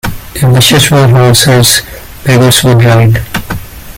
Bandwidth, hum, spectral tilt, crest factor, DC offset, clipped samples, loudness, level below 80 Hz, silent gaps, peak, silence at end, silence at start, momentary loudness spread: over 20 kHz; none; -4.5 dB/octave; 6 dB; under 0.1%; 0.6%; -6 LUFS; -28 dBFS; none; 0 dBFS; 0 s; 0.05 s; 13 LU